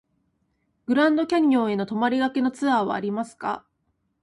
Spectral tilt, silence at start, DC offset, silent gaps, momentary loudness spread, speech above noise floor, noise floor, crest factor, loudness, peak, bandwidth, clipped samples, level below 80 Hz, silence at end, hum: -6 dB/octave; 0.9 s; under 0.1%; none; 11 LU; 50 dB; -73 dBFS; 14 dB; -23 LUFS; -10 dBFS; 11.5 kHz; under 0.1%; -68 dBFS; 0.65 s; none